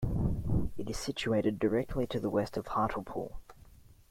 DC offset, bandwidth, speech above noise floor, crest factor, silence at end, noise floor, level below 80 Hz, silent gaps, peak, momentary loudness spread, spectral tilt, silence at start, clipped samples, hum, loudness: under 0.1%; 16.5 kHz; 24 dB; 16 dB; 0.15 s; -56 dBFS; -44 dBFS; none; -18 dBFS; 8 LU; -6.5 dB/octave; 0 s; under 0.1%; none; -33 LUFS